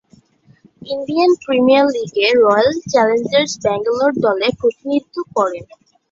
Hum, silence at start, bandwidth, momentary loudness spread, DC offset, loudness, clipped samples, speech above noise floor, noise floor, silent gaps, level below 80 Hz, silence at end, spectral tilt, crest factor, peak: none; 0.85 s; 7.8 kHz; 9 LU; under 0.1%; -15 LUFS; under 0.1%; 36 dB; -51 dBFS; none; -56 dBFS; 0.45 s; -4.5 dB/octave; 14 dB; -2 dBFS